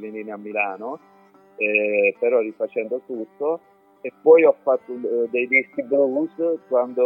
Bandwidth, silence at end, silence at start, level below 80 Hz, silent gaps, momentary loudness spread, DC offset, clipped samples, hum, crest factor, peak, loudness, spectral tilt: 3.2 kHz; 0 s; 0 s; -84 dBFS; none; 17 LU; under 0.1%; under 0.1%; none; 18 dB; -2 dBFS; -21 LUFS; -8.5 dB/octave